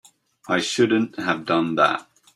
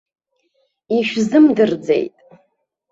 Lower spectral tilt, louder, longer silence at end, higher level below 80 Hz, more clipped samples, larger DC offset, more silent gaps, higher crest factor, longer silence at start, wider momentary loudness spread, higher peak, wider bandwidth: second, -4.5 dB/octave vs -6 dB/octave; second, -21 LUFS vs -16 LUFS; second, 0.35 s vs 0.85 s; second, -66 dBFS vs -60 dBFS; neither; neither; neither; about the same, 18 dB vs 16 dB; second, 0.45 s vs 0.9 s; about the same, 6 LU vs 8 LU; about the same, -4 dBFS vs -2 dBFS; first, 12.5 kHz vs 7.8 kHz